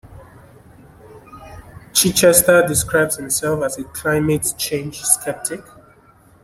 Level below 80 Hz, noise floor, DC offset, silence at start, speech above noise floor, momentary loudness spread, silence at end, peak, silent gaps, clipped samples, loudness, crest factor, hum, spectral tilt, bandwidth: -46 dBFS; -50 dBFS; under 0.1%; 0.1 s; 33 dB; 13 LU; 0.85 s; 0 dBFS; none; under 0.1%; -16 LUFS; 20 dB; none; -3 dB/octave; 16.5 kHz